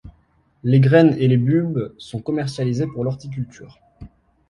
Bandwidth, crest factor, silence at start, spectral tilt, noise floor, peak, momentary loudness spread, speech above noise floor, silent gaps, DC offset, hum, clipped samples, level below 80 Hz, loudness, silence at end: 10.5 kHz; 18 dB; 0.05 s; -8.5 dB/octave; -59 dBFS; -2 dBFS; 16 LU; 41 dB; none; under 0.1%; none; under 0.1%; -52 dBFS; -19 LUFS; 0.45 s